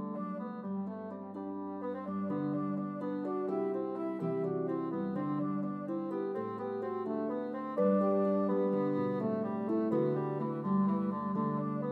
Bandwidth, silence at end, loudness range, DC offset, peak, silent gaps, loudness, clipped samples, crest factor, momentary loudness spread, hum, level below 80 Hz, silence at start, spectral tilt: 4.5 kHz; 0 s; 5 LU; under 0.1%; -18 dBFS; none; -34 LUFS; under 0.1%; 16 dB; 9 LU; none; -88 dBFS; 0 s; -11 dB/octave